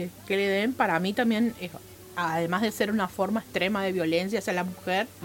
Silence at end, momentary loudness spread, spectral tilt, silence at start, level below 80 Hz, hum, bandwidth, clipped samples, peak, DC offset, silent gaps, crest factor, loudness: 0 s; 6 LU; -5 dB/octave; 0 s; -62 dBFS; none; 17 kHz; under 0.1%; -8 dBFS; under 0.1%; none; 18 dB; -27 LUFS